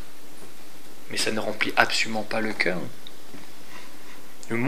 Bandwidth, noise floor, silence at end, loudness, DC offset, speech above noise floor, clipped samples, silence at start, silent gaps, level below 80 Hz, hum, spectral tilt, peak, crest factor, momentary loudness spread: 16 kHz; -48 dBFS; 0 s; -25 LUFS; 5%; 22 dB; under 0.1%; 0 s; none; -70 dBFS; none; -3 dB/octave; 0 dBFS; 30 dB; 24 LU